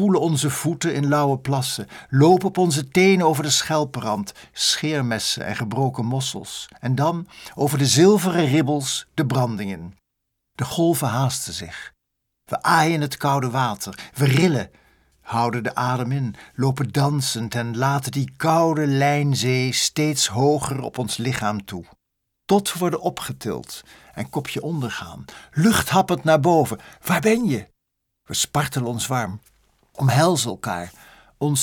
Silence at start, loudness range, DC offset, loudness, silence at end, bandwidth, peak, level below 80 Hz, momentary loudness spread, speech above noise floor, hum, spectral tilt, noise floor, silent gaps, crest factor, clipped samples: 0 s; 6 LU; under 0.1%; -21 LUFS; 0 s; 19 kHz; -2 dBFS; -56 dBFS; 14 LU; 56 dB; none; -4.5 dB/octave; -77 dBFS; none; 20 dB; under 0.1%